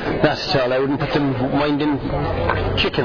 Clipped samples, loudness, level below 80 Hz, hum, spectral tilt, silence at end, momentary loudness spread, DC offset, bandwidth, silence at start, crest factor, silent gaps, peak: under 0.1%; -19 LUFS; -34 dBFS; none; -7 dB/octave; 0 s; 3 LU; 0.5%; 5.4 kHz; 0 s; 16 dB; none; -4 dBFS